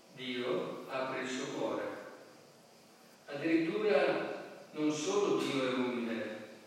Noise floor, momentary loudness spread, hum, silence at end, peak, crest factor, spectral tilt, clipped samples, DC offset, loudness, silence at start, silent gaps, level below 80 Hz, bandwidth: -60 dBFS; 14 LU; none; 0 s; -18 dBFS; 18 dB; -4.5 dB/octave; under 0.1%; under 0.1%; -35 LUFS; 0.1 s; none; under -90 dBFS; 15.5 kHz